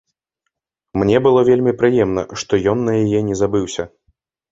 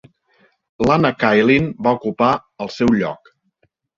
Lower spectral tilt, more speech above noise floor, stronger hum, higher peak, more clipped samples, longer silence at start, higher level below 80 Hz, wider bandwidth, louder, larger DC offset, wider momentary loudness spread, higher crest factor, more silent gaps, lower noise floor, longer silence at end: about the same, -6.5 dB/octave vs -7 dB/octave; first, 61 dB vs 49 dB; neither; about the same, 0 dBFS vs 0 dBFS; neither; first, 0.95 s vs 0.8 s; about the same, -46 dBFS vs -48 dBFS; about the same, 8 kHz vs 7.6 kHz; about the same, -16 LUFS vs -17 LUFS; neither; about the same, 12 LU vs 10 LU; about the same, 16 dB vs 18 dB; neither; first, -77 dBFS vs -65 dBFS; second, 0.65 s vs 0.8 s